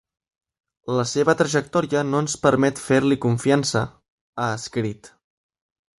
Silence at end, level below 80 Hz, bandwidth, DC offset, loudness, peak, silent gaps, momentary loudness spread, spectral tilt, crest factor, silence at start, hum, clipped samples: 0.95 s; -56 dBFS; 11.5 kHz; under 0.1%; -21 LUFS; -2 dBFS; 4.08-4.33 s; 11 LU; -5 dB/octave; 20 dB; 0.85 s; none; under 0.1%